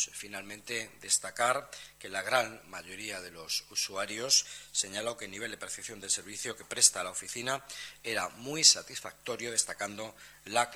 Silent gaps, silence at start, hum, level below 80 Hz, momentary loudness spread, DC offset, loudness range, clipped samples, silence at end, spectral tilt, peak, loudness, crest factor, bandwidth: none; 0 s; none; -70 dBFS; 17 LU; under 0.1%; 5 LU; under 0.1%; 0 s; 0 dB/octave; -8 dBFS; -30 LUFS; 26 dB; over 20 kHz